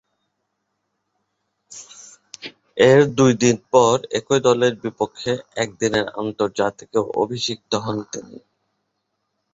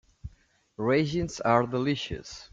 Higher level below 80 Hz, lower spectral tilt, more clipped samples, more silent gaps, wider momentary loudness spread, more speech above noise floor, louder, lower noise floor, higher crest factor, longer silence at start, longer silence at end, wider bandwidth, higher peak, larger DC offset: second, -58 dBFS vs -50 dBFS; second, -4.5 dB/octave vs -6 dB/octave; neither; neither; about the same, 22 LU vs 23 LU; first, 56 dB vs 36 dB; first, -19 LUFS vs -27 LUFS; first, -75 dBFS vs -63 dBFS; about the same, 20 dB vs 22 dB; first, 1.7 s vs 0.25 s; first, 1.2 s vs 0.05 s; second, 8 kHz vs 9.2 kHz; first, -2 dBFS vs -8 dBFS; neither